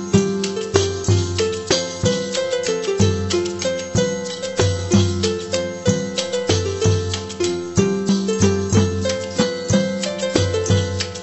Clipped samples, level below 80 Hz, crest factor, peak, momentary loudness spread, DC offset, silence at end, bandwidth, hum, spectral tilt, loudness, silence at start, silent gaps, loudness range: under 0.1%; -44 dBFS; 20 dB; 0 dBFS; 5 LU; under 0.1%; 0 s; 8.4 kHz; none; -5 dB/octave; -20 LUFS; 0 s; none; 1 LU